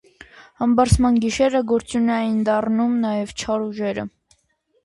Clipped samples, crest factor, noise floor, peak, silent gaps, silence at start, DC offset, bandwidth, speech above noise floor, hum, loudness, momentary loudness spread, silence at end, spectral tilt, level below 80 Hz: under 0.1%; 18 dB; -66 dBFS; -2 dBFS; none; 0.4 s; under 0.1%; 11.5 kHz; 47 dB; none; -20 LUFS; 9 LU; 0.75 s; -6 dB/octave; -36 dBFS